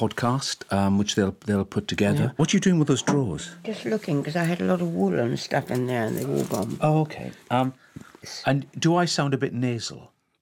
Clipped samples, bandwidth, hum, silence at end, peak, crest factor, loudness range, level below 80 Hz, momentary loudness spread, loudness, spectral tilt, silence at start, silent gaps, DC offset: under 0.1%; 17 kHz; none; 0.35 s; -10 dBFS; 16 dB; 3 LU; -60 dBFS; 8 LU; -25 LUFS; -5.5 dB/octave; 0 s; none; under 0.1%